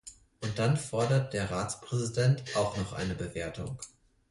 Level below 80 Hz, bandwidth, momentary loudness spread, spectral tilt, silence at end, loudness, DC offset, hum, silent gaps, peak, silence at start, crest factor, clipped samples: -54 dBFS; 11.5 kHz; 12 LU; -5.5 dB/octave; 0.4 s; -31 LUFS; under 0.1%; none; none; -14 dBFS; 0.05 s; 16 dB; under 0.1%